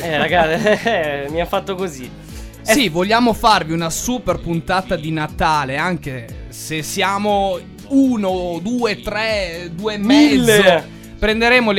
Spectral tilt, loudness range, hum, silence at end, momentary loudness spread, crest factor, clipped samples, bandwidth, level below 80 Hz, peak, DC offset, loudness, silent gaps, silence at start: -4.5 dB/octave; 4 LU; none; 0 s; 14 LU; 16 dB; under 0.1%; 16.5 kHz; -36 dBFS; -2 dBFS; under 0.1%; -17 LUFS; none; 0 s